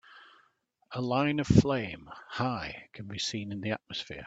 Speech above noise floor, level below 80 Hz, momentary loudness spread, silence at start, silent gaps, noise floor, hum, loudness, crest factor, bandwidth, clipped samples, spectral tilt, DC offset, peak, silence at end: 40 dB; -54 dBFS; 17 LU; 0.1 s; none; -70 dBFS; none; -30 LUFS; 24 dB; 8 kHz; under 0.1%; -6 dB/octave; under 0.1%; -8 dBFS; 0 s